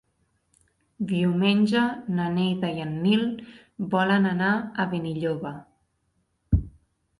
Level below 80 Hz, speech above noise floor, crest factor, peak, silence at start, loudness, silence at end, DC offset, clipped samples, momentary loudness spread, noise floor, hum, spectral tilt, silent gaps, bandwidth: -42 dBFS; 48 dB; 16 dB; -10 dBFS; 1 s; -25 LUFS; 0.5 s; under 0.1%; under 0.1%; 13 LU; -72 dBFS; none; -7.5 dB/octave; none; 11 kHz